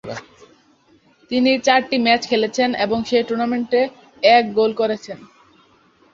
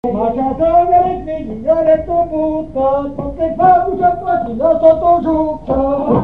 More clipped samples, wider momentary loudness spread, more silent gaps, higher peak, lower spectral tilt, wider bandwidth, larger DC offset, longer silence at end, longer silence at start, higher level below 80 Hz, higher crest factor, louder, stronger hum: neither; first, 13 LU vs 8 LU; neither; about the same, -2 dBFS vs 0 dBFS; second, -4 dB/octave vs -10 dB/octave; first, 7.6 kHz vs 4.1 kHz; second, under 0.1% vs 1%; first, 0.9 s vs 0 s; about the same, 0.05 s vs 0.05 s; second, -58 dBFS vs -34 dBFS; about the same, 18 dB vs 14 dB; second, -18 LUFS vs -14 LUFS; neither